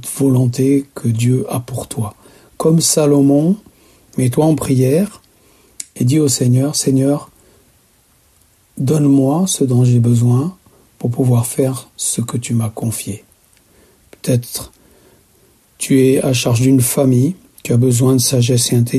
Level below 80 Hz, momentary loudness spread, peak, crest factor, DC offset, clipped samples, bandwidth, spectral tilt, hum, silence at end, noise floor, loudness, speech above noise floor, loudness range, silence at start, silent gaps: -50 dBFS; 12 LU; 0 dBFS; 14 dB; under 0.1%; under 0.1%; 14 kHz; -6 dB/octave; none; 0 s; -54 dBFS; -15 LUFS; 40 dB; 6 LU; 0 s; none